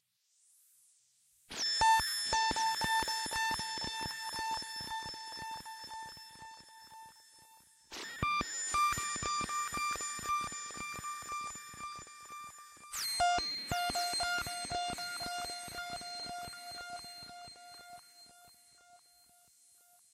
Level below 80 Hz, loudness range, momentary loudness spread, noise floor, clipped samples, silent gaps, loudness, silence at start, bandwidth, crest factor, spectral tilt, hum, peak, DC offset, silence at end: -60 dBFS; 13 LU; 20 LU; -73 dBFS; under 0.1%; none; -35 LUFS; 1.5 s; 16 kHz; 22 dB; -1 dB/octave; none; -16 dBFS; under 0.1%; 1.15 s